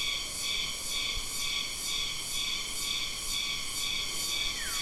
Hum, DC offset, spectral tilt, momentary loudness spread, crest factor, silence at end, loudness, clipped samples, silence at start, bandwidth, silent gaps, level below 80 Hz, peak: none; under 0.1%; 0.5 dB/octave; 1 LU; 16 dB; 0 s; -31 LUFS; under 0.1%; 0 s; 16 kHz; none; -48 dBFS; -18 dBFS